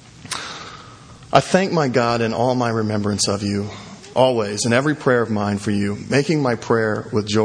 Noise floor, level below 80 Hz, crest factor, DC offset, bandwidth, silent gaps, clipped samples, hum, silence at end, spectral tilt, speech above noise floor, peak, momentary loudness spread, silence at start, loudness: -41 dBFS; -54 dBFS; 20 dB; under 0.1%; 11 kHz; none; under 0.1%; none; 0 s; -5 dB/octave; 23 dB; 0 dBFS; 11 LU; 0.2 s; -19 LUFS